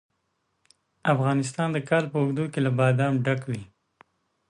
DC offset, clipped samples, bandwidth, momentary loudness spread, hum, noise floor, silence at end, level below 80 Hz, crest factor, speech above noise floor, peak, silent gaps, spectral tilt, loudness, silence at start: under 0.1%; under 0.1%; 11 kHz; 7 LU; none; -75 dBFS; 0.85 s; -66 dBFS; 18 dB; 51 dB; -8 dBFS; none; -7 dB/octave; -25 LUFS; 1.05 s